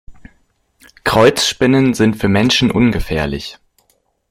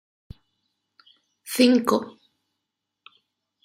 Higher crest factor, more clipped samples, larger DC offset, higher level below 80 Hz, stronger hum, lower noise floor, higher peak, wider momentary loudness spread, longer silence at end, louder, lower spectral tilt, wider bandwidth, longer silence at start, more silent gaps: second, 16 dB vs 22 dB; neither; neither; first, -34 dBFS vs -60 dBFS; neither; second, -61 dBFS vs -83 dBFS; first, 0 dBFS vs -6 dBFS; second, 10 LU vs 24 LU; second, 0.75 s vs 1.55 s; first, -14 LUFS vs -21 LUFS; about the same, -5 dB/octave vs -4 dB/octave; about the same, 16.5 kHz vs 16 kHz; second, 0.1 s vs 1.45 s; neither